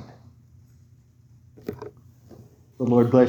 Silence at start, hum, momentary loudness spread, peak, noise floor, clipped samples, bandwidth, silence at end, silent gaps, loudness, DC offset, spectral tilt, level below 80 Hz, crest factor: 0 s; none; 30 LU; -4 dBFS; -54 dBFS; under 0.1%; 19 kHz; 0 s; none; -24 LUFS; under 0.1%; -9.5 dB/octave; -64 dBFS; 22 dB